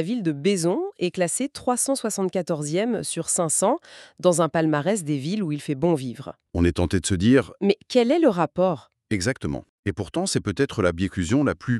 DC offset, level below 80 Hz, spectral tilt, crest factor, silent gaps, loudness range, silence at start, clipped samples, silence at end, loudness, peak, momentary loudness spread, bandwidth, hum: under 0.1%; -46 dBFS; -5 dB/octave; 18 dB; 9.69-9.83 s; 2 LU; 0 s; under 0.1%; 0 s; -23 LUFS; -6 dBFS; 8 LU; 13.5 kHz; none